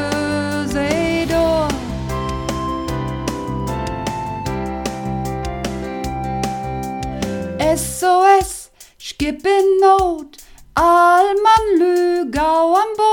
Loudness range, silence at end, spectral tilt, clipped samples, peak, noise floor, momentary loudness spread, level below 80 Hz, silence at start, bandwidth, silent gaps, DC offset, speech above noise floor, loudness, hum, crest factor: 9 LU; 0 s; -5 dB/octave; under 0.1%; 0 dBFS; -38 dBFS; 12 LU; -34 dBFS; 0 s; 17.5 kHz; none; under 0.1%; 25 dB; -17 LUFS; none; 16 dB